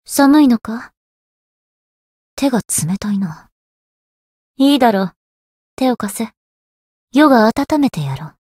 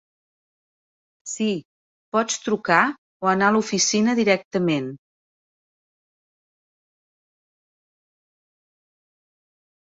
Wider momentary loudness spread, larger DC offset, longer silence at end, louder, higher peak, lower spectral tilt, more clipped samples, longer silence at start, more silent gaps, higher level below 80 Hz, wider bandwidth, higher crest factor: first, 15 LU vs 9 LU; neither; second, 0.2 s vs 4.95 s; first, -15 LUFS vs -21 LUFS; about the same, 0 dBFS vs -2 dBFS; first, -5 dB/octave vs -3.5 dB/octave; neither; second, 0.1 s vs 1.25 s; first, 0.97-2.37 s, 3.52-4.55 s, 5.16-5.77 s, 6.37-7.08 s vs 1.65-2.12 s, 2.98-3.20 s, 4.45-4.51 s; first, -52 dBFS vs -68 dBFS; first, 16 kHz vs 8 kHz; second, 16 dB vs 24 dB